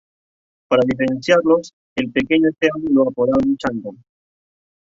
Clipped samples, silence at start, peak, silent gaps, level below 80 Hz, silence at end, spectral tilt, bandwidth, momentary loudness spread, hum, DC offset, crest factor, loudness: under 0.1%; 0.7 s; -2 dBFS; 1.73-1.96 s; -52 dBFS; 0.9 s; -6 dB/octave; 7.6 kHz; 10 LU; none; under 0.1%; 18 dB; -18 LUFS